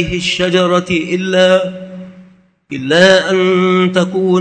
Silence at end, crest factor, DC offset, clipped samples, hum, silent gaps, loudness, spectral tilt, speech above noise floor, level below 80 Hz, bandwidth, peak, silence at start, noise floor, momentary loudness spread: 0 s; 12 dB; under 0.1%; under 0.1%; none; none; -12 LUFS; -5 dB/octave; 33 dB; -42 dBFS; 9.2 kHz; 0 dBFS; 0 s; -45 dBFS; 17 LU